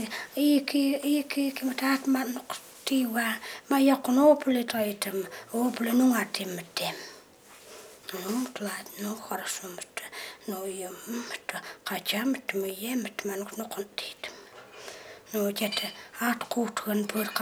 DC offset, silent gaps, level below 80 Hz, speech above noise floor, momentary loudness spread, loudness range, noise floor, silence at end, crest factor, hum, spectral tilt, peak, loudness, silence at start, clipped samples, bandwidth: under 0.1%; none; -76 dBFS; 24 dB; 16 LU; 10 LU; -53 dBFS; 0 s; 20 dB; none; -3.5 dB/octave; -10 dBFS; -29 LUFS; 0 s; under 0.1%; over 20 kHz